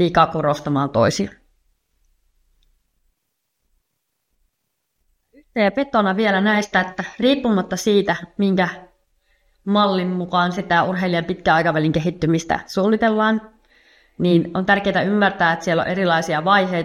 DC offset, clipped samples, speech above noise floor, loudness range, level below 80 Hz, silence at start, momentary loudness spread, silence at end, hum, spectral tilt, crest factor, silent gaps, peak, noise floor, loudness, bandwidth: under 0.1%; under 0.1%; 57 dB; 6 LU; -52 dBFS; 0 s; 5 LU; 0 s; none; -5.5 dB/octave; 20 dB; none; 0 dBFS; -75 dBFS; -19 LUFS; 13.5 kHz